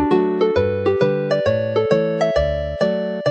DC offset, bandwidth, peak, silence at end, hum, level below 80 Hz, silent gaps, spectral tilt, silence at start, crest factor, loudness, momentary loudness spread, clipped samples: under 0.1%; 8.4 kHz; -2 dBFS; 0 s; none; -36 dBFS; none; -7.5 dB/octave; 0 s; 16 dB; -19 LUFS; 3 LU; under 0.1%